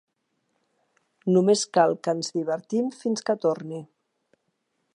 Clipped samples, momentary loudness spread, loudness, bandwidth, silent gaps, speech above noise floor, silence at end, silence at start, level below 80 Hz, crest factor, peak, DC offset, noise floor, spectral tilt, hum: under 0.1%; 13 LU; -24 LUFS; 11 kHz; none; 52 dB; 1.1 s; 1.25 s; -78 dBFS; 20 dB; -6 dBFS; under 0.1%; -75 dBFS; -5 dB/octave; none